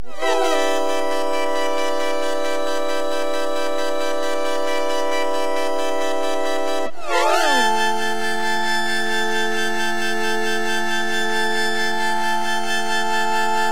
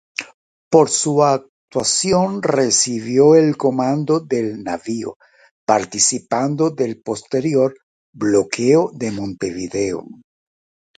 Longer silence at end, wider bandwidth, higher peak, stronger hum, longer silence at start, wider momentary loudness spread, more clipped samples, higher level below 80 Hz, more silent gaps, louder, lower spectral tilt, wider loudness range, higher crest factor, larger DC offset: second, 0 s vs 0.85 s; first, 16.5 kHz vs 9.4 kHz; second, -6 dBFS vs 0 dBFS; neither; second, 0 s vs 0.2 s; second, 4 LU vs 12 LU; neither; about the same, -58 dBFS vs -56 dBFS; second, none vs 0.34-0.71 s, 1.49-1.68 s, 5.16-5.20 s, 5.51-5.67 s, 7.83-8.13 s; second, -21 LUFS vs -17 LUFS; second, -2 dB/octave vs -4 dB/octave; about the same, 3 LU vs 4 LU; about the same, 16 dB vs 18 dB; first, 9% vs under 0.1%